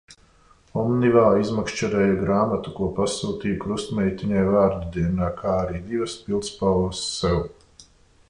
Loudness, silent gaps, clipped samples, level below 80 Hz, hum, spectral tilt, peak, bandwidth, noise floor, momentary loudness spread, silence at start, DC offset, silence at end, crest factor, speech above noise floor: -23 LUFS; none; under 0.1%; -42 dBFS; none; -6 dB/octave; -4 dBFS; 11 kHz; -55 dBFS; 9 LU; 0.1 s; under 0.1%; 0.45 s; 18 dB; 33 dB